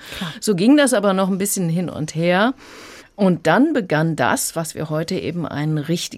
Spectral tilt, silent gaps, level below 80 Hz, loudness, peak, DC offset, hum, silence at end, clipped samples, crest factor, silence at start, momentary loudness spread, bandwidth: -5 dB/octave; none; -56 dBFS; -19 LUFS; -4 dBFS; under 0.1%; none; 0 s; under 0.1%; 16 dB; 0 s; 11 LU; 16 kHz